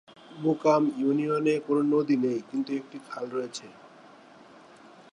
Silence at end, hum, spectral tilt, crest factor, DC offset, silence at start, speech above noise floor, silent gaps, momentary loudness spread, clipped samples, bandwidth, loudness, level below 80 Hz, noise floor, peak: 1.25 s; none; -6.5 dB/octave; 18 dB; under 0.1%; 0.3 s; 25 dB; none; 13 LU; under 0.1%; 10.5 kHz; -27 LUFS; -80 dBFS; -52 dBFS; -10 dBFS